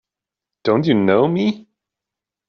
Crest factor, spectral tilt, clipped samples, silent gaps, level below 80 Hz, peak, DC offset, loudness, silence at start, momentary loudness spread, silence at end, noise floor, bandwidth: 18 dB; -6 dB/octave; under 0.1%; none; -60 dBFS; -2 dBFS; under 0.1%; -17 LUFS; 0.65 s; 9 LU; 0.9 s; -87 dBFS; 6.6 kHz